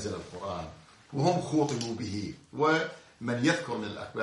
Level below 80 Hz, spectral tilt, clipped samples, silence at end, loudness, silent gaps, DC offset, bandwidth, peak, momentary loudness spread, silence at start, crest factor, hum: -64 dBFS; -5.5 dB/octave; under 0.1%; 0 s; -31 LUFS; none; under 0.1%; 11.5 kHz; -12 dBFS; 12 LU; 0 s; 20 dB; none